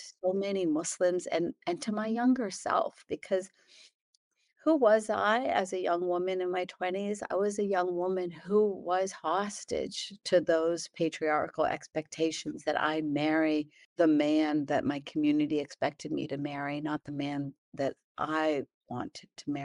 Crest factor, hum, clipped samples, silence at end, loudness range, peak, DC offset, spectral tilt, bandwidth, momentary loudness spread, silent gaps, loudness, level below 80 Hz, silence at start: 18 dB; none; under 0.1%; 0 s; 4 LU; -12 dBFS; under 0.1%; -5 dB/octave; 11.5 kHz; 9 LU; 3.94-4.31 s, 13.85-13.96 s, 17.58-17.72 s, 18.04-18.15 s, 18.74-18.81 s; -31 LUFS; -70 dBFS; 0 s